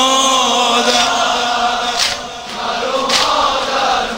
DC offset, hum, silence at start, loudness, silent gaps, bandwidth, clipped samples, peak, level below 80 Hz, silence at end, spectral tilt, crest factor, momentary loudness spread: under 0.1%; none; 0 s; -14 LUFS; none; 16.5 kHz; under 0.1%; 0 dBFS; -44 dBFS; 0 s; -0.5 dB/octave; 14 dB; 8 LU